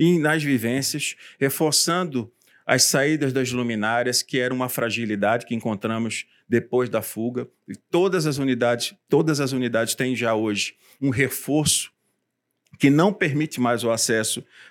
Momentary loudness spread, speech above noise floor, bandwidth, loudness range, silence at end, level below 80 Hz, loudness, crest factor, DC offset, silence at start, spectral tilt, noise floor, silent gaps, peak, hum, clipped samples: 10 LU; 54 dB; 19 kHz; 3 LU; 0.05 s; -66 dBFS; -22 LUFS; 20 dB; under 0.1%; 0 s; -4 dB/octave; -77 dBFS; none; -2 dBFS; none; under 0.1%